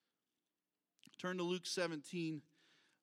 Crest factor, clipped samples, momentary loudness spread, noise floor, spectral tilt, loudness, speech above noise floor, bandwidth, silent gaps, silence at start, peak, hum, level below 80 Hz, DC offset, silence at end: 20 dB; under 0.1%; 10 LU; under -90 dBFS; -4.5 dB/octave; -43 LUFS; over 48 dB; 16 kHz; none; 1.2 s; -24 dBFS; none; under -90 dBFS; under 0.1%; 0.6 s